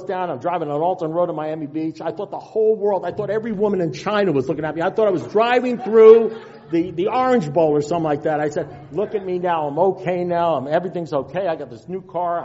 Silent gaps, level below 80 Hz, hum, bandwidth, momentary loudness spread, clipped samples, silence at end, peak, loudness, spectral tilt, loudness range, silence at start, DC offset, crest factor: none; -58 dBFS; none; 7.8 kHz; 9 LU; under 0.1%; 0 s; 0 dBFS; -20 LUFS; -5.5 dB/octave; 6 LU; 0 s; under 0.1%; 18 dB